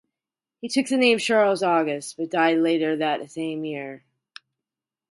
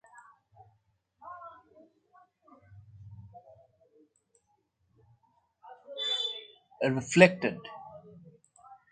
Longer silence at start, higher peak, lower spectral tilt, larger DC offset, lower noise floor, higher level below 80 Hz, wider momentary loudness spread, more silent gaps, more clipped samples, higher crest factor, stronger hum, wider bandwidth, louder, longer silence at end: second, 0.65 s vs 1.25 s; about the same, -4 dBFS vs -2 dBFS; about the same, -4 dB/octave vs -4.5 dB/octave; neither; first, -89 dBFS vs -75 dBFS; second, -76 dBFS vs -70 dBFS; second, 12 LU vs 30 LU; neither; neither; second, 20 dB vs 32 dB; neither; first, 11.5 kHz vs 9 kHz; first, -22 LUFS vs -27 LUFS; first, 1.15 s vs 0.2 s